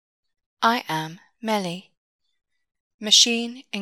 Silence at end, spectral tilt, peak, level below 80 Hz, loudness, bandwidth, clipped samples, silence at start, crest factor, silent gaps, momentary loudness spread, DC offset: 0 s; -1.5 dB/octave; -2 dBFS; -84 dBFS; -20 LUFS; 18 kHz; under 0.1%; 0.6 s; 24 dB; 1.97-2.19 s, 2.80-2.99 s; 20 LU; under 0.1%